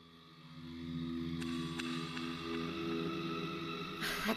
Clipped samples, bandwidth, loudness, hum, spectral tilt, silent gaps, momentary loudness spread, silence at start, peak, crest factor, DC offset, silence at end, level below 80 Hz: under 0.1%; 14 kHz; -40 LUFS; 50 Hz at -60 dBFS; -5 dB/octave; none; 11 LU; 0 s; -20 dBFS; 20 dB; under 0.1%; 0 s; -62 dBFS